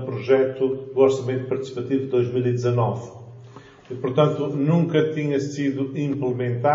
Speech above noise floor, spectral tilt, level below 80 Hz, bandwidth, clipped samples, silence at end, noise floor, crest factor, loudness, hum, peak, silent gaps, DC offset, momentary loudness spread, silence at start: 23 dB; -7 dB/octave; -66 dBFS; 7.6 kHz; under 0.1%; 0 s; -45 dBFS; 18 dB; -22 LUFS; none; -4 dBFS; none; under 0.1%; 9 LU; 0 s